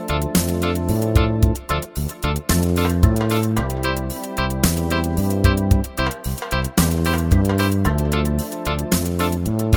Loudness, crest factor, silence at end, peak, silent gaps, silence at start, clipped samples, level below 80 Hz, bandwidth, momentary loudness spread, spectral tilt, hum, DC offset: -20 LUFS; 18 dB; 0 s; -2 dBFS; none; 0 s; under 0.1%; -26 dBFS; over 20 kHz; 6 LU; -5.5 dB/octave; none; under 0.1%